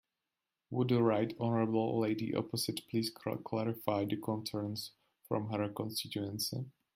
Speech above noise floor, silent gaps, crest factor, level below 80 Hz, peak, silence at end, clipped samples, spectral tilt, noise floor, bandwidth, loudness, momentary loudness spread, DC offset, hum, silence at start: 55 dB; none; 20 dB; -74 dBFS; -16 dBFS; 0.25 s; under 0.1%; -5.5 dB/octave; -90 dBFS; 16 kHz; -36 LUFS; 8 LU; under 0.1%; none; 0.7 s